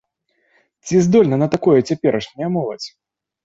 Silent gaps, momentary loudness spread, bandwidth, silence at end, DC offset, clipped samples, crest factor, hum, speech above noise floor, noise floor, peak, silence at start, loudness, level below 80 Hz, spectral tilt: none; 16 LU; 8 kHz; 0.55 s; under 0.1%; under 0.1%; 16 dB; none; 50 dB; -66 dBFS; -2 dBFS; 0.85 s; -17 LUFS; -54 dBFS; -7 dB/octave